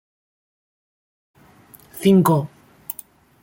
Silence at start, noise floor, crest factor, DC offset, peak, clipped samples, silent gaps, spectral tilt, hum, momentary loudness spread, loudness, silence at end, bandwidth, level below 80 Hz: 1.95 s; -49 dBFS; 20 dB; under 0.1%; -4 dBFS; under 0.1%; none; -7 dB/octave; none; 23 LU; -17 LUFS; 0.5 s; 17 kHz; -60 dBFS